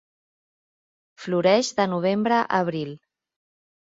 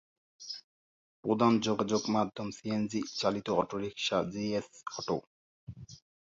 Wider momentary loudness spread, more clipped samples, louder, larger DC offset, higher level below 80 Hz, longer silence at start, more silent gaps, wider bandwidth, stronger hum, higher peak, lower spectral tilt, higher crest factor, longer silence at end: second, 13 LU vs 20 LU; neither; first, -22 LUFS vs -32 LUFS; neither; about the same, -70 dBFS vs -66 dBFS; first, 1.2 s vs 0.4 s; second, none vs 0.64-1.23 s, 5.27-5.67 s; about the same, 7.8 kHz vs 7.6 kHz; neither; first, -6 dBFS vs -10 dBFS; about the same, -5 dB/octave vs -5 dB/octave; about the same, 18 dB vs 22 dB; first, 1 s vs 0.45 s